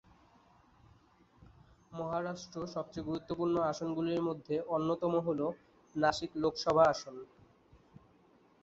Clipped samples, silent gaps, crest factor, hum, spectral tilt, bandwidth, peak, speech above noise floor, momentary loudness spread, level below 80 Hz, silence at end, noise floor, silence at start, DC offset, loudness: under 0.1%; none; 22 dB; none; -5 dB/octave; 7.6 kHz; -14 dBFS; 32 dB; 14 LU; -66 dBFS; 1.35 s; -66 dBFS; 1.9 s; under 0.1%; -34 LUFS